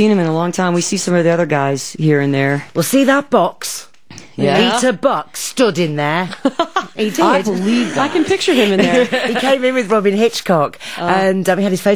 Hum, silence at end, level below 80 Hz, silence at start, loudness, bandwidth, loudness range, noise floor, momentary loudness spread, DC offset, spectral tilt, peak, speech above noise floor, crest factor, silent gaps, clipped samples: none; 0 s; -56 dBFS; 0 s; -15 LUFS; over 20 kHz; 2 LU; -39 dBFS; 6 LU; 0.9%; -5 dB/octave; 0 dBFS; 25 dB; 14 dB; none; under 0.1%